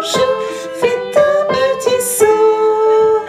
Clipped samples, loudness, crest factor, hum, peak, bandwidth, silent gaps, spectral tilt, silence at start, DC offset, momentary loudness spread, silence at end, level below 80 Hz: under 0.1%; -13 LUFS; 12 dB; none; 0 dBFS; 15.5 kHz; none; -2.5 dB/octave; 0 s; under 0.1%; 6 LU; 0 s; -54 dBFS